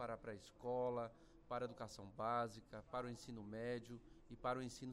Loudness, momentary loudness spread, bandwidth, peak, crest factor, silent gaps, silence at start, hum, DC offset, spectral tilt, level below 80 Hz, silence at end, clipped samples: -47 LUFS; 11 LU; 15.5 kHz; -30 dBFS; 18 dB; none; 0 s; none; under 0.1%; -5.5 dB/octave; -70 dBFS; 0 s; under 0.1%